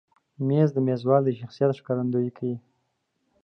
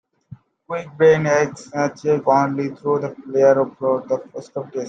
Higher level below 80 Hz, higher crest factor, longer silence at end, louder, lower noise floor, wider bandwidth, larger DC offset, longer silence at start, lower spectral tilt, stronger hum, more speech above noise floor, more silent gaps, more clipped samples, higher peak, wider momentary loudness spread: second, -74 dBFS vs -64 dBFS; about the same, 18 dB vs 18 dB; first, 0.85 s vs 0 s; second, -25 LUFS vs -19 LUFS; first, -75 dBFS vs -44 dBFS; second, 6.4 kHz vs 8 kHz; neither; about the same, 0.4 s vs 0.3 s; first, -10 dB/octave vs -6.5 dB/octave; neither; first, 51 dB vs 25 dB; neither; neither; second, -6 dBFS vs -2 dBFS; second, 10 LU vs 14 LU